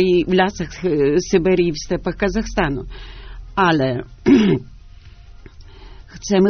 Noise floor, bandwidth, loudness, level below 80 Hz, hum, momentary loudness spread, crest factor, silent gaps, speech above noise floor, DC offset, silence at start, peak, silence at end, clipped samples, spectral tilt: -41 dBFS; 6.6 kHz; -18 LUFS; -36 dBFS; none; 15 LU; 16 dB; none; 24 dB; under 0.1%; 0 s; -2 dBFS; 0 s; under 0.1%; -5.5 dB/octave